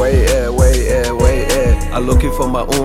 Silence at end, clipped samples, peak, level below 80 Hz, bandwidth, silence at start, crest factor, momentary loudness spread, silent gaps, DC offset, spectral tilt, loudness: 0 s; under 0.1%; -2 dBFS; -16 dBFS; 16 kHz; 0 s; 12 dB; 4 LU; none; under 0.1%; -5.5 dB/octave; -14 LUFS